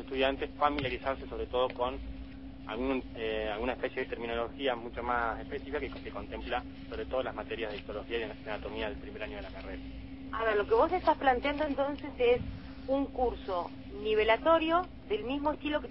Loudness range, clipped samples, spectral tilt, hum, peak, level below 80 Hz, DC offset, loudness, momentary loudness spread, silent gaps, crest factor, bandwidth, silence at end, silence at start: 7 LU; under 0.1%; -8.5 dB/octave; none; -12 dBFS; -48 dBFS; 0.2%; -33 LUFS; 15 LU; none; 20 dB; 5.8 kHz; 0 s; 0 s